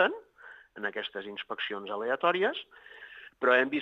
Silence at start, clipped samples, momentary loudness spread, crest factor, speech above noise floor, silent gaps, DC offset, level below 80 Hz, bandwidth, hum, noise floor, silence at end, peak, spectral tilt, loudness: 0 s; under 0.1%; 23 LU; 22 dB; 23 dB; none; under 0.1%; -80 dBFS; 6.8 kHz; none; -53 dBFS; 0 s; -10 dBFS; -5.5 dB/octave; -30 LUFS